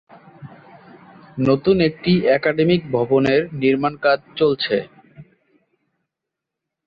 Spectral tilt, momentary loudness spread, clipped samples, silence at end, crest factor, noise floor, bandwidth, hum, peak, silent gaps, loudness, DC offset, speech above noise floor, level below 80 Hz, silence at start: -8.5 dB/octave; 6 LU; under 0.1%; 1.65 s; 16 dB; -83 dBFS; 6.8 kHz; none; -4 dBFS; none; -18 LUFS; under 0.1%; 66 dB; -52 dBFS; 0.4 s